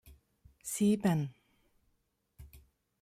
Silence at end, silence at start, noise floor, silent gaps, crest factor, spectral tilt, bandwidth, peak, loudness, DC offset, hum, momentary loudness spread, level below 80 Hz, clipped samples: 0.45 s; 0.05 s; -78 dBFS; none; 20 dB; -6 dB/octave; 15 kHz; -18 dBFS; -32 LUFS; under 0.1%; none; 14 LU; -64 dBFS; under 0.1%